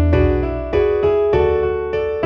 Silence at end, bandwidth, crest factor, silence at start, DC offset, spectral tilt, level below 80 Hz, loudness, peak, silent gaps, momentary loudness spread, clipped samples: 0 s; 5.8 kHz; 12 dB; 0 s; under 0.1%; -9.5 dB/octave; -26 dBFS; -17 LUFS; -4 dBFS; none; 5 LU; under 0.1%